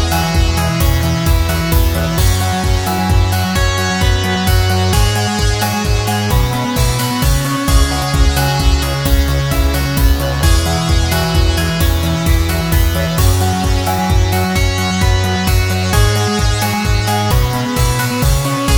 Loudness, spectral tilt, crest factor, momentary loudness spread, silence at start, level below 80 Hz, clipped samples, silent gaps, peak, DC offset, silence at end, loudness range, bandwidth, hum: -14 LUFS; -4.5 dB/octave; 12 dB; 2 LU; 0 s; -18 dBFS; under 0.1%; none; 0 dBFS; under 0.1%; 0 s; 0 LU; over 20 kHz; none